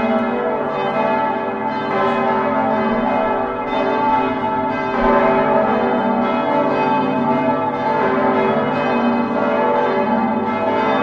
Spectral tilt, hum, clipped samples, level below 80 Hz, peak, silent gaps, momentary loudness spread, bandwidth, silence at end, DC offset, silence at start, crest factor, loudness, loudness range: -7.5 dB/octave; none; under 0.1%; -46 dBFS; -2 dBFS; none; 4 LU; 6.6 kHz; 0 s; under 0.1%; 0 s; 16 dB; -17 LUFS; 2 LU